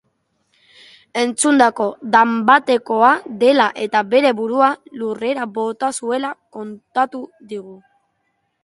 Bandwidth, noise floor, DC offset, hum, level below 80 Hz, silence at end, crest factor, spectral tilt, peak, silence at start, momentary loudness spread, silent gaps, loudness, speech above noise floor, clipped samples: 11.5 kHz; -69 dBFS; under 0.1%; none; -66 dBFS; 0.85 s; 18 dB; -3 dB/octave; 0 dBFS; 1.15 s; 18 LU; none; -17 LUFS; 52 dB; under 0.1%